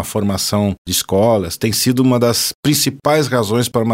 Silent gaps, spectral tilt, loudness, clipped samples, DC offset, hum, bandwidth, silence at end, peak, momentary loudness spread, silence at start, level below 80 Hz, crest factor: 0.78-0.85 s, 2.55-2.63 s; -4.5 dB/octave; -15 LUFS; under 0.1%; under 0.1%; none; 16.5 kHz; 0 s; -2 dBFS; 4 LU; 0 s; -46 dBFS; 14 dB